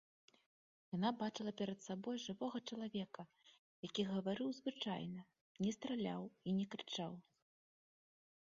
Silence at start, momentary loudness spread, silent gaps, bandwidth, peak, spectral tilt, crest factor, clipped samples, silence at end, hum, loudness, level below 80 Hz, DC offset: 0.9 s; 9 LU; 3.59-3.83 s, 5.41-5.55 s; 7.4 kHz; -24 dBFS; -5 dB/octave; 20 dB; under 0.1%; 1.25 s; none; -44 LUFS; -82 dBFS; under 0.1%